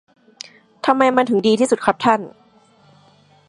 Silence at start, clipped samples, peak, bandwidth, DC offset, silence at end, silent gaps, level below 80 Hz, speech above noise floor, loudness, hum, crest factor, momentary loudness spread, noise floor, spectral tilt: 0.85 s; under 0.1%; 0 dBFS; 11.5 kHz; under 0.1%; 1.2 s; none; -62 dBFS; 36 dB; -17 LUFS; none; 20 dB; 23 LU; -53 dBFS; -4.5 dB/octave